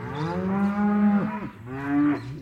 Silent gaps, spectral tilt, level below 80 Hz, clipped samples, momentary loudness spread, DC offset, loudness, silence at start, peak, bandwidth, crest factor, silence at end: none; -9 dB/octave; -56 dBFS; under 0.1%; 12 LU; under 0.1%; -25 LUFS; 0 s; -12 dBFS; 6 kHz; 12 dB; 0 s